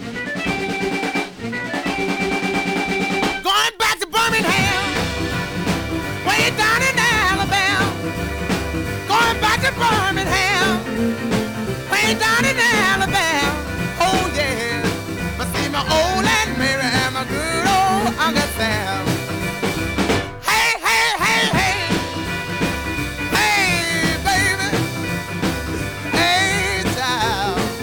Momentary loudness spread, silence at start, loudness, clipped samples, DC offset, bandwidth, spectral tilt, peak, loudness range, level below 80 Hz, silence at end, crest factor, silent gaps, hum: 8 LU; 0 s; -18 LUFS; under 0.1%; 0.1%; over 20 kHz; -3.5 dB/octave; -4 dBFS; 2 LU; -36 dBFS; 0 s; 16 dB; none; none